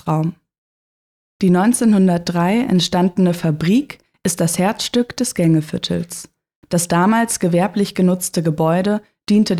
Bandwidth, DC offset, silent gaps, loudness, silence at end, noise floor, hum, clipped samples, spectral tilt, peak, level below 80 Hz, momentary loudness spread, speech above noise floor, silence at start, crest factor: 15 kHz; under 0.1%; 0.58-1.40 s, 6.56-6.62 s; -17 LUFS; 0 s; under -90 dBFS; none; under 0.1%; -5.5 dB/octave; -4 dBFS; -52 dBFS; 8 LU; over 74 dB; 0.05 s; 12 dB